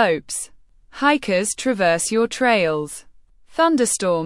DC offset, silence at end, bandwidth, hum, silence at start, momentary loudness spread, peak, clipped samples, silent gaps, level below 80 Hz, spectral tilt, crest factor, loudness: under 0.1%; 0 s; 12 kHz; none; 0 s; 12 LU; -4 dBFS; under 0.1%; none; -54 dBFS; -3.5 dB/octave; 16 dB; -19 LUFS